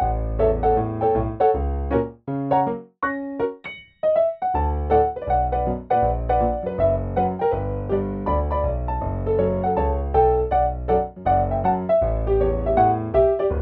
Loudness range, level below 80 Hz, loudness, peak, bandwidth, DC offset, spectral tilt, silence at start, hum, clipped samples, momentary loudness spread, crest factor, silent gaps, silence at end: 3 LU; -30 dBFS; -22 LUFS; -6 dBFS; 4.3 kHz; under 0.1%; -11.5 dB/octave; 0 s; none; under 0.1%; 7 LU; 16 dB; none; 0 s